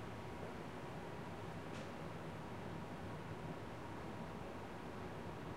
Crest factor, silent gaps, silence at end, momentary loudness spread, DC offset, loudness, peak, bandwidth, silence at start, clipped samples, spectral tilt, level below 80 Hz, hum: 14 dB; none; 0 s; 1 LU; 0.1%; -49 LUFS; -34 dBFS; 16 kHz; 0 s; under 0.1%; -6.5 dB/octave; -66 dBFS; none